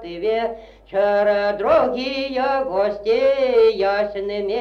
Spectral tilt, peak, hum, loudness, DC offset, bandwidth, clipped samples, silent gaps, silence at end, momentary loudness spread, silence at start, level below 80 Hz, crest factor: -5.5 dB/octave; -6 dBFS; 50 Hz at -50 dBFS; -19 LUFS; under 0.1%; 6.6 kHz; under 0.1%; none; 0 s; 8 LU; 0 s; -50 dBFS; 14 dB